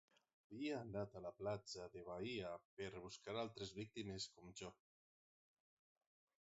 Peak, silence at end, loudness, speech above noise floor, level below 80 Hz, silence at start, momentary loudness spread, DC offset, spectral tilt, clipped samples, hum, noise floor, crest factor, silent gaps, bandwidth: -34 dBFS; 1.75 s; -51 LUFS; over 40 dB; -76 dBFS; 0.5 s; 8 LU; under 0.1%; -4.5 dB/octave; under 0.1%; none; under -90 dBFS; 18 dB; 2.65-2.77 s; 7.6 kHz